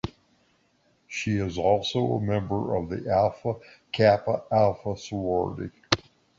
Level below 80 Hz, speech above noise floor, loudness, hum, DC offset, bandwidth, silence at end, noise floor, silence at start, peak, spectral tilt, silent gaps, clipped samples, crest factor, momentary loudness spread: -50 dBFS; 41 dB; -26 LUFS; none; under 0.1%; 7.8 kHz; 0.4 s; -67 dBFS; 0.05 s; -2 dBFS; -6 dB/octave; none; under 0.1%; 24 dB; 11 LU